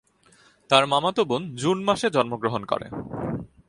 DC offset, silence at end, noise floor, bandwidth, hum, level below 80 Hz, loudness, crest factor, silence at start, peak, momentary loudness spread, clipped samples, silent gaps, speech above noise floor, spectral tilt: under 0.1%; 0.25 s; -58 dBFS; 11.5 kHz; none; -56 dBFS; -24 LUFS; 24 dB; 0.7 s; -2 dBFS; 12 LU; under 0.1%; none; 34 dB; -4.5 dB/octave